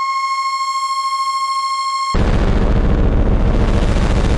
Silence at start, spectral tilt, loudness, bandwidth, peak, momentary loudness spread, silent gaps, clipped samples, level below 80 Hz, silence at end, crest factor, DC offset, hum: 0 s; -5.5 dB/octave; -17 LUFS; 11.5 kHz; -4 dBFS; 2 LU; none; under 0.1%; -18 dBFS; 0 s; 10 dB; under 0.1%; none